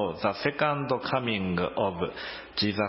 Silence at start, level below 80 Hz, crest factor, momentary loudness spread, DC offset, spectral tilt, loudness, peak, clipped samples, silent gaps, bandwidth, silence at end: 0 s; -54 dBFS; 18 dB; 7 LU; under 0.1%; -9.5 dB/octave; -29 LUFS; -10 dBFS; under 0.1%; none; 5.8 kHz; 0 s